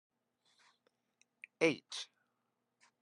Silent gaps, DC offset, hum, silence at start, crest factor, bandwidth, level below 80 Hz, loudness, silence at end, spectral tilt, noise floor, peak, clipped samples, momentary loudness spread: none; under 0.1%; none; 1.6 s; 26 dB; 11.5 kHz; under -90 dBFS; -37 LUFS; 0.95 s; -4 dB/octave; -85 dBFS; -16 dBFS; under 0.1%; 24 LU